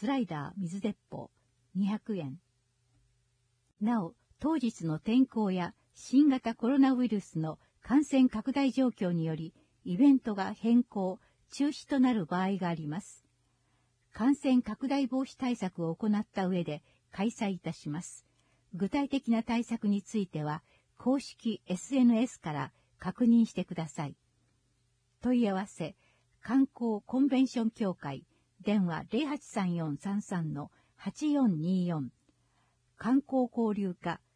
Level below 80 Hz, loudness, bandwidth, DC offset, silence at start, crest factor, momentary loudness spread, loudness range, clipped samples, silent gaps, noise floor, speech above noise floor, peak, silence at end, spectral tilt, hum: -68 dBFS; -31 LUFS; 10.5 kHz; under 0.1%; 0 s; 16 dB; 15 LU; 6 LU; under 0.1%; none; -74 dBFS; 44 dB; -16 dBFS; 0.2 s; -7 dB/octave; none